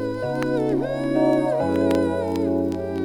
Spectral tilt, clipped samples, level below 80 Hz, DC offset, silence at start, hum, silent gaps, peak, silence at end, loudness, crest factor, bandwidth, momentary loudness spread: -7.5 dB/octave; under 0.1%; -52 dBFS; under 0.1%; 0 s; none; none; -6 dBFS; 0 s; -22 LUFS; 16 dB; 16.5 kHz; 5 LU